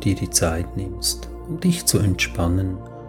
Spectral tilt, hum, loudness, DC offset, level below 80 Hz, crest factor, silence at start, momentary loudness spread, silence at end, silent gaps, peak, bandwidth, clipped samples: -4 dB/octave; none; -22 LUFS; under 0.1%; -34 dBFS; 20 dB; 0 s; 10 LU; 0 s; none; -2 dBFS; 17.5 kHz; under 0.1%